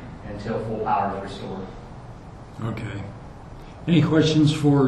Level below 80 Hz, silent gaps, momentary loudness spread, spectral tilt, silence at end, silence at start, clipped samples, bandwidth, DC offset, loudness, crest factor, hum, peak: -44 dBFS; none; 23 LU; -7 dB/octave; 0 s; 0 s; under 0.1%; 10.5 kHz; under 0.1%; -23 LUFS; 18 dB; none; -6 dBFS